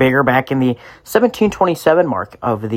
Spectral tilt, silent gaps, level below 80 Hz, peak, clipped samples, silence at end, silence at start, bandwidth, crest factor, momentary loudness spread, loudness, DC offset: -6.5 dB/octave; none; -48 dBFS; 0 dBFS; under 0.1%; 0 s; 0 s; 16.5 kHz; 16 dB; 8 LU; -16 LUFS; under 0.1%